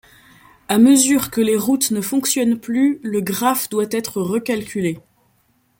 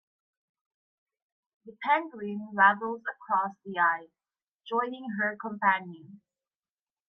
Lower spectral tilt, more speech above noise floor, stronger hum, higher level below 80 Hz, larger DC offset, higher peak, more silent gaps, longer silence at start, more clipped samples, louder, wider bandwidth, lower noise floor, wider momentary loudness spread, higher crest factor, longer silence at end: second, -4 dB/octave vs -7.5 dB/octave; second, 44 dB vs over 61 dB; neither; first, -58 dBFS vs -84 dBFS; neither; first, -2 dBFS vs -8 dBFS; second, none vs 4.48-4.59 s; second, 0.7 s vs 1.65 s; neither; first, -18 LUFS vs -28 LUFS; first, 17 kHz vs 5.6 kHz; second, -61 dBFS vs under -90 dBFS; second, 10 LU vs 14 LU; second, 16 dB vs 24 dB; second, 0.8 s vs 0.95 s